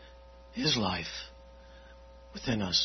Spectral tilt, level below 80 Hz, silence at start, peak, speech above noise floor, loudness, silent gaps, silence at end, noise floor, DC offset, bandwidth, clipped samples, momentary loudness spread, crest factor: -3.5 dB/octave; -54 dBFS; 0 s; -14 dBFS; 21 dB; -31 LUFS; none; 0 s; -52 dBFS; under 0.1%; 6.4 kHz; under 0.1%; 25 LU; 22 dB